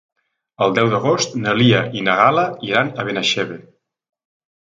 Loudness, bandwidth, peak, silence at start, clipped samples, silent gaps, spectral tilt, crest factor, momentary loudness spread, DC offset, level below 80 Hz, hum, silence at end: -17 LUFS; 9 kHz; 0 dBFS; 0.6 s; under 0.1%; none; -4.5 dB/octave; 18 dB; 7 LU; under 0.1%; -58 dBFS; none; 1.05 s